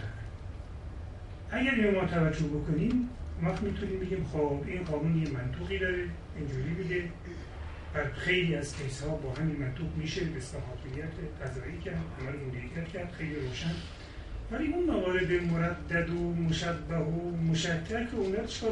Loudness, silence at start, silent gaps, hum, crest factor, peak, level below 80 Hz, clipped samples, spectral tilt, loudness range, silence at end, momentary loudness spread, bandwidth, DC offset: -33 LUFS; 0 s; none; none; 18 dB; -14 dBFS; -44 dBFS; under 0.1%; -6.5 dB/octave; 7 LU; 0 s; 14 LU; 10.5 kHz; under 0.1%